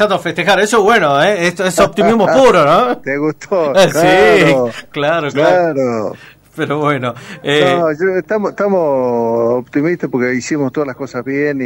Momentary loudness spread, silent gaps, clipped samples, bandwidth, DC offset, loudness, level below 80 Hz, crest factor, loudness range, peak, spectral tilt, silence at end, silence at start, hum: 11 LU; none; under 0.1%; 16.5 kHz; under 0.1%; -13 LUFS; -46 dBFS; 12 dB; 5 LU; -2 dBFS; -5 dB/octave; 0 s; 0 s; none